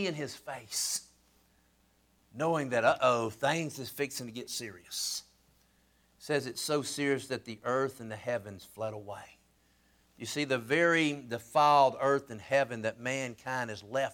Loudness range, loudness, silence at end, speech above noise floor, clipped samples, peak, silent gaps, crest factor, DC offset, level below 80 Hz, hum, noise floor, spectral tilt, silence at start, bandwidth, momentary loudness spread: 8 LU; -31 LUFS; 0 s; 37 dB; under 0.1%; -12 dBFS; none; 20 dB; under 0.1%; -72 dBFS; none; -69 dBFS; -3.5 dB/octave; 0 s; over 20 kHz; 13 LU